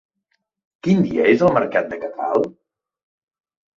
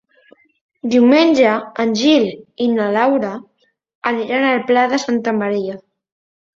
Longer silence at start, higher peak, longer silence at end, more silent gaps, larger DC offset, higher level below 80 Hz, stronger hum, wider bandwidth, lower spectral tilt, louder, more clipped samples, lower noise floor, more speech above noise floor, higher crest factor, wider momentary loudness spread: about the same, 0.85 s vs 0.85 s; about the same, -2 dBFS vs -2 dBFS; first, 1.25 s vs 0.8 s; second, none vs 3.95-4.02 s; neither; first, -56 dBFS vs -62 dBFS; neither; about the same, 7.2 kHz vs 7.6 kHz; first, -8 dB/octave vs -5 dB/octave; second, -19 LUFS vs -16 LUFS; neither; first, -72 dBFS vs -52 dBFS; first, 55 dB vs 37 dB; about the same, 20 dB vs 16 dB; about the same, 13 LU vs 13 LU